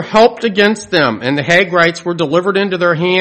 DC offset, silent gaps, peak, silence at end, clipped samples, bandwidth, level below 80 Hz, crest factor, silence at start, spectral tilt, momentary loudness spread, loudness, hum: under 0.1%; none; 0 dBFS; 0 s; 0.2%; 11.5 kHz; -50 dBFS; 12 dB; 0 s; -5 dB/octave; 4 LU; -12 LUFS; none